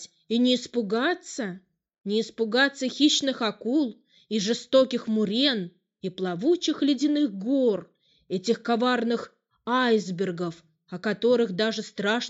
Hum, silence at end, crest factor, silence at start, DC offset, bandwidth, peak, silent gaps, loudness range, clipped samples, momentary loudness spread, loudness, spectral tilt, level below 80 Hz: none; 0 s; 18 dB; 0 s; under 0.1%; 8.2 kHz; -8 dBFS; none; 2 LU; under 0.1%; 11 LU; -25 LUFS; -4 dB/octave; -74 dBFS